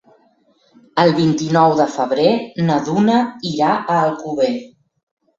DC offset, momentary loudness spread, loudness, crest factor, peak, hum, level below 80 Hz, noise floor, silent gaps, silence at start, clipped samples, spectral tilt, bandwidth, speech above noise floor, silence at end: under 0.1%; 6 LU; -16 LUFS; 16 dB; -2 dBFS; none; -58 dBFS; -57 dBFS; none; 0.95 s; under 0.1%; -6.5 dB/octave; 7.8 kHz; 41 dB; 0.7 s